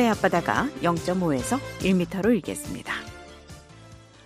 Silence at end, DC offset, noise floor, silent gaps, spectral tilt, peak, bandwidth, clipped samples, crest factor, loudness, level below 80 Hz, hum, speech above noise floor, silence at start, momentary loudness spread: 0.3 s; under 0.1%; -48 dBFS; none; -5.5 dB/octave; -6 dBFS; 15.5 kHz; under 0.1%; 20 dB; -25 LUFS; -48 dBFS; none; 23 dB; 0 s; 21 LU